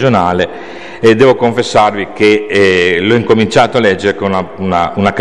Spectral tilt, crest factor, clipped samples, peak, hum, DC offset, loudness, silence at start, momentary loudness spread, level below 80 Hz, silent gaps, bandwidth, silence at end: -5.5 dB/octave; 10 dB; 0.1%; 0 dBFS; none; 1%; -10 LUFS; 0 s; 7 LU; -42 dBFS; none; 10.5 kHz; 0 s